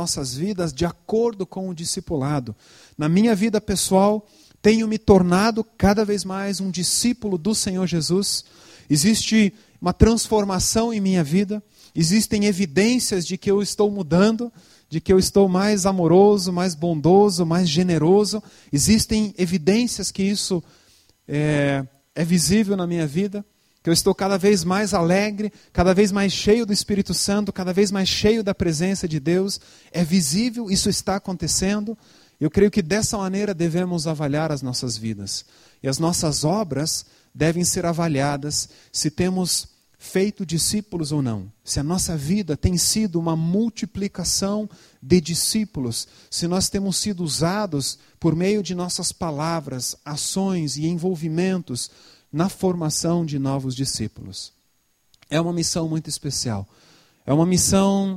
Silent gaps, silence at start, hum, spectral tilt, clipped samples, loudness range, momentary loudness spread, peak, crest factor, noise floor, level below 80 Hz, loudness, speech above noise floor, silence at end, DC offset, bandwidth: none; 0 s; none; -4.5 dB/octave; under 0.1%; 5 LU; 10 LU; 0 dBFS; 20 dB; -66 dBFS; -42 dBFS; -21 LUFS; 46 dB; 0 s; under 0.1%; 16 kHz